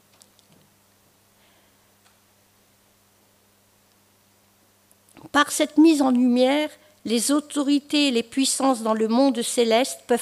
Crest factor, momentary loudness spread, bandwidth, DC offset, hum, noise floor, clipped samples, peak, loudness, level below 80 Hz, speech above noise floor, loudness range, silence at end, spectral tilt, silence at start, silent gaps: 18 dB; 7 LU; 15.5 kHz; under 0.1%; none; -60 dBFS; under 0.1%; -6 dBFS; -21 LUFS; -72 dBFS; 40 dB; 5 LU; 0 s; -2.5 dB/octave; 5.25 s; none